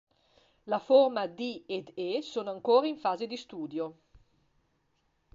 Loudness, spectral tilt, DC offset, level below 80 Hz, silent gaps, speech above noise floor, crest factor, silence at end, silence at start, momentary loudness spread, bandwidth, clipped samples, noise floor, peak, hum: -30 LUFS; -5.5 dB/octave; under 0.1%; -72 dBFS; none; 45 dB; 20 dB; 1.4 s; 0.65 s; 14 LU; 7.4 kHz; under 0.1%; -74 dBFS; -10 dBFS; none